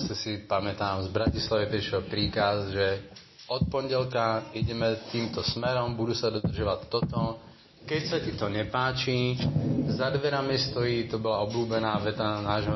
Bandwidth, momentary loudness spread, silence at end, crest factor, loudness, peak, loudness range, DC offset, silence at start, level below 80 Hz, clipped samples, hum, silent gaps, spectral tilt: 6.2 kHz; 5 LU; 0 s; 16 dB; -29 LUFS; -12 dBFS; 2 LU; under 0.1%; 0 s; -46 dBFS; under 0.1%; none; none; -6 dB/octave